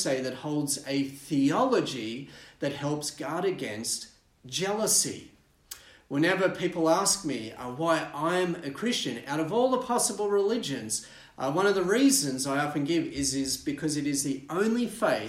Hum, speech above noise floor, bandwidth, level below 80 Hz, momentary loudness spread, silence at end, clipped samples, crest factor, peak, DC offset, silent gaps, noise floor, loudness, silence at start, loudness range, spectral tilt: none; 21 dB; 16 kHz; -62 dBFS; 11 LU; 0 s; under 0.1%; 16 dB; -12 dBFS; under 0.1%; none; -49 dBFS; -28 LUFS; 0 s; 3 LU; -3.5 dB/octave